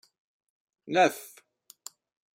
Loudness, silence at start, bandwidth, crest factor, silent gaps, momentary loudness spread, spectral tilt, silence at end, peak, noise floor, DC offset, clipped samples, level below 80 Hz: -26 LUFS; 0.9 s; 16 kHz; 22 dB; none; 23 LU; -3.5 dB/octave; 1.1 s; -10 dBFS; -58 dBFS; under 0.1%; under 0.1%; -82 dBFS